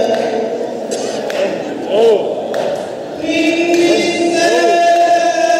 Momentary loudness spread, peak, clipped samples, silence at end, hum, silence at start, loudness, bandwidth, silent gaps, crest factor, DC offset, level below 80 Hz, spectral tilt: 10 LU; -2 dBFS; under 0.1%; 0 s; none; 0 s; -14 LUFS; 15 kHz; none; 12 dB; under 0.1%; -60 dBFS; -3.5 dB/octave